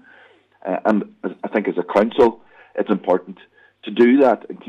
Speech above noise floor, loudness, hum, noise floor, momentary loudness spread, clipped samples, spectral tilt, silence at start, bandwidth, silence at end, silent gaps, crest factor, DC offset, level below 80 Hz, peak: 33 dB; -19 LUFS; none; -51 dBFS; 15 LU; under 0.1%; -7.5 dB/octave; 0.65 s; 7.6 kHz; 0.15 s; none; 14 dB; under 0.1%; -60 dBFS; -4 dBFS